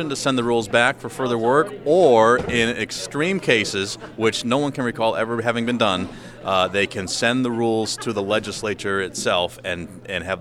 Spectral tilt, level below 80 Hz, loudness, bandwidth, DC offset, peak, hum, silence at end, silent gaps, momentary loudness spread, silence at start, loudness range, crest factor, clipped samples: -4 dB/octave; -52 dBFS; -21 LUFS; 15 kHz; under 0.1%; -2 dBFS; none; 0 s; none; 9 LU; 0 s; 4 LU; 18 dB; under 0.1%